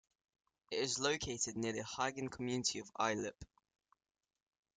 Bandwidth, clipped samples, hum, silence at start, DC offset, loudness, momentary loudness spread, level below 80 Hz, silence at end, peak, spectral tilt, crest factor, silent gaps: 10 kHz; under 0.1%; none; 0.7 s; under 0.1%; -39 LUFS; 7 LU; -68 dBFS; 1.3 s; -18 dBFS; -3 dB/octave; 22 dB; none